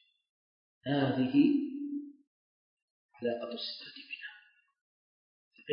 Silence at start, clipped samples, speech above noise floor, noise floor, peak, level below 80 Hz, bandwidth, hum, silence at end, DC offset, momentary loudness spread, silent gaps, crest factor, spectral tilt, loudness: 0.85 s; under 0.1%; 31 dB; -61 dBFS; -16 dBFS; -80 dBFS; 5.4 kHz; none; 0 s; under 0.1%; 18 LU; 2.27-3.09 s, 4.81-5.51 s; 20 dB; -9.5 dB/octave; -33 LUFS